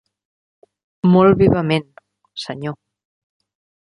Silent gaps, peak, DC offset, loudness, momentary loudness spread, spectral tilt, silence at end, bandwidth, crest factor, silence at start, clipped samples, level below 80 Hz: none; -2 dBFS; under 0.1%; -16 LUFS; 19 LU; -8 dB/octave; 1.15 s; 10.5 kHz; 18 dB; 1.05 s; under 0.1%; -46 dBFS